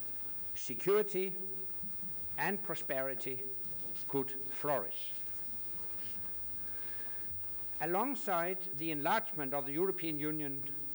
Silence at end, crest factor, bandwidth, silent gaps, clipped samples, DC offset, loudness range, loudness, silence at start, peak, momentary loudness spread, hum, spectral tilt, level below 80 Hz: 0 s; 14 dB; over 20 kHz; none; under 0.1%; under 0.1%; 1 LU; -33 LUFS; 0 s; -20 dBFS; 3 LU; none; -5 dB/octave; -68 dBFS